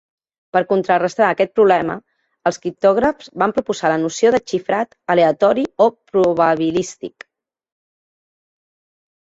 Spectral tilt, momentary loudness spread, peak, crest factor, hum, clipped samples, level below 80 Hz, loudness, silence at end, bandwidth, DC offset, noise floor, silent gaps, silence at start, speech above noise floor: -5 dB/octave; 8 LU; -2 dBFS; 16 dB; none; under 0.1%; -56 dBFS; -17 LUFS; 2.3 s; 8 kHz; under 0.1%; under -90 dBFS; none; 0.55 s; over 73 dB